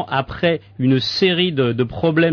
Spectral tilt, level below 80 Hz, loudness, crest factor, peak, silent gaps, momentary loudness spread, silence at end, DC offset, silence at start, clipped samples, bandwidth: -7 dB/octave; -46 dBFS; -18 LUFS; 12 dB; -6 dBFS; none; 4 LU; 0 s; under 0.1%; 0 s; under 0.1%; 5.4 kHz